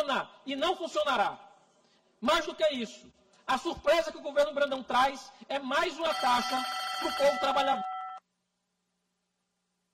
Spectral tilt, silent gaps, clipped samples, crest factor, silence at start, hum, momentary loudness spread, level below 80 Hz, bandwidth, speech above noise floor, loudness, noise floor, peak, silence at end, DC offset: -2.5 dB/octave; none; under 0.1%; 16 dB; 0 s; none; 11 LU; -62 dBFS; 16 kHz; 51 dB; -30 LUFS; -81 dBFS; -14 dBFS; 1.75 s; under 0.1%